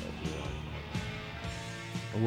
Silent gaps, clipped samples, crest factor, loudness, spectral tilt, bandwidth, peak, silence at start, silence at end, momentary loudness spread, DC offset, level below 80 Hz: none; under 0.1%; 20 dB; -39 LUFS; -5.5 dB/octave; 16.5 kHz; -16 dBFS; 0 s; 0 s; 2 LU; under 0.1%; -48 dBFS